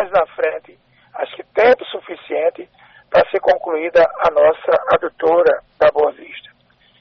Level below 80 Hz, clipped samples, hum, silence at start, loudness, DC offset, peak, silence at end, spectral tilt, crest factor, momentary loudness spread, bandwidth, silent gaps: -54 dBFS; under 0.1%; none; 0 s; -16 LUFS; under 0.1%; -4 dBFS; 0.6 s; -1.5 dB/octave; 12 dB; 15 LU; 6.2 kHz; none